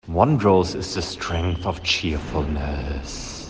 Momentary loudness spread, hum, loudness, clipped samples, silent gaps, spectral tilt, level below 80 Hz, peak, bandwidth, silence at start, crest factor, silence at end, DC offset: 11 LU; none; -23 LUFS; under 0.1%; none; -5.5 dB/octave; -34 dBFS; -2 dBFS; 9.8 kHz; 0.05 s; 20 dB; 0 s; under 0.1%